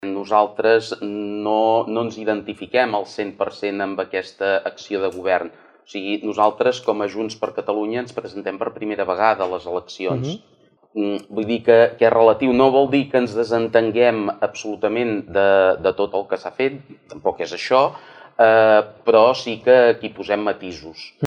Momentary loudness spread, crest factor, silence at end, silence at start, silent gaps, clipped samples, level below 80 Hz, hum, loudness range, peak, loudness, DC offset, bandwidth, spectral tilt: 12 LU; 18 dB; 0 s; 0 s; none; under 0.1%; -60 dBFS; none; 7 LU; -2 dBFS; -19 LUFS; under 0.1%; 9.2 kHz; -5.5 dB/octave